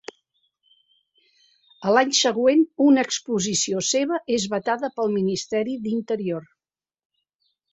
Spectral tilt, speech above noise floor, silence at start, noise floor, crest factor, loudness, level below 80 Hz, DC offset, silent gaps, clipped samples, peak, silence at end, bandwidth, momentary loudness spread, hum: -3.5 dB/octave; over 68 dB; 1.8 s; under -90 dBFS; 20 dB; -22 LUFS; -66 dBFS; under 0.1%; none; under 0.1%; -4 dBFS; 1.3 s; 8.4 kHz; 9 LU; none